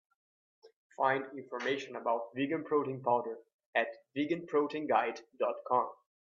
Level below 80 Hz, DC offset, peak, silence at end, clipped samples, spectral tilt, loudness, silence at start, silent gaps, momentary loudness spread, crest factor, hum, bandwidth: -84 dBFS; under 0.1%; -14 dBFS; 0.3 s; under 0.1%; -6 dB/octave; -34 LUFS; 0.65 s; 0.76-0.90 s, 3.54-3.59 s, 3.66-3.73 s; 7 LU; 20 dB; none; 7.4 kHz